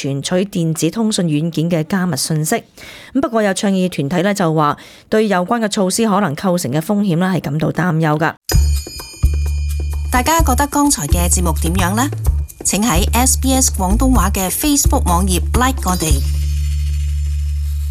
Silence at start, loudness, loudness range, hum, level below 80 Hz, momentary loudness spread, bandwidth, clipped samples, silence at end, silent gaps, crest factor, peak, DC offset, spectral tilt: 0 s; -16 LUFS; 3 LU; none; -22 dBFS; 7 LU; 16 kHz; under 0.1%; 0 s; 8.37-8.41 s; 14 dB; -2 dBFS; under 0.1%; -4.5 dB/octave